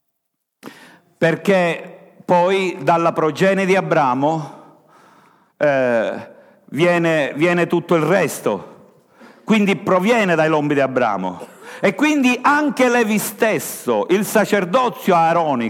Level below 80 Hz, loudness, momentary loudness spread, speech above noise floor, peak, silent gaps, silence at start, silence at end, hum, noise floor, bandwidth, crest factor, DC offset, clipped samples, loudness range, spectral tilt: -68 dBFS; -17 LUFS; 9 LU; 59 dB; -2 dBFS; none; 0.65 s; 0 s; none; -75 dBFS; 17.5 kHz; 16 dB; under 0.1%; under 0.1%; 3 LU; -5.5 dB/octave